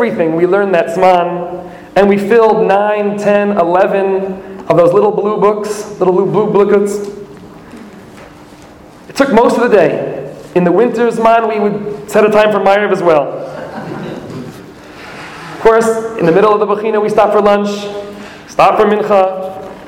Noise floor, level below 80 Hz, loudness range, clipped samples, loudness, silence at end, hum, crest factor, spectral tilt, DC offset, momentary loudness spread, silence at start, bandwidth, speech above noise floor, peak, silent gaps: -36 dBFS; -46 dBFS; 4 LU; under 0.1%; -11 LUFS; 0 s; none; 12 dB; -6 dB/octave; under 0.1%; 16 LU; 0 s; 16.5 kHz; 26 dB; 0 dBFS; none